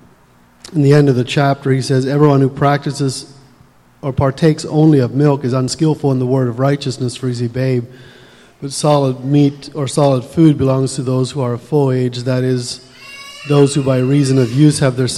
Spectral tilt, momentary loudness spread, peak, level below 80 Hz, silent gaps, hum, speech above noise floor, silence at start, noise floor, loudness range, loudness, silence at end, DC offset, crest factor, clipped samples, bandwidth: -6.5 dB/octave; 10 LU; 0 dBFS; -48 dBFS; none; none; 35 dB; 0.65 s; -48 dBFS; 3 LU; -14 LUFS; 0 s; under 0.1%; 14 dB; under 0.1%; 12 kHz